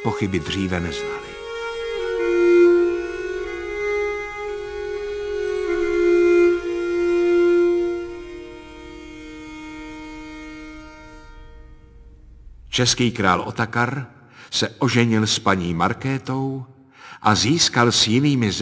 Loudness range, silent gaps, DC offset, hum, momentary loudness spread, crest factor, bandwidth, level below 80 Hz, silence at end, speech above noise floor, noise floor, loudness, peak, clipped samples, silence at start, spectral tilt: 17 LU; none; under 0.1%; none; 20 LU; 20 dB; 8 kHz; -44 dBFS; 0 s; 25 dB; -45 dBFS; -20 LUFS; 0 dBFS; under 0.1%; 0 s; -4.5 dB/octave